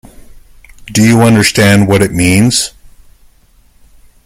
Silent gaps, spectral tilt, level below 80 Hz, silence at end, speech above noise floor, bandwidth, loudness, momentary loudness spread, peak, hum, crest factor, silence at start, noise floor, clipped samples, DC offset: none; -4.5 dB/octave; -38 dBFS; 1.55 s; 38 dB; 16.5 kHz; -9 LUFS; 7 LU; 0 dBFS; none; 12 dB; 0.35 s; -46 dBFS; under 0.1%; under 0.1%